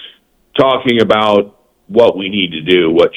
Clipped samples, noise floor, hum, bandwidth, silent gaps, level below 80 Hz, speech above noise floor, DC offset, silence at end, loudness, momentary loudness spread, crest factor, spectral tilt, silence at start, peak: 0.2%; -43 dBFS; none; 10 kHz; none; -50 dBFS; 32 dB; under 0.1%; 0 s; -12 LUFS; 6 LU; 12 dB; -6.5 dB/octave; 0 s; 0 dBFS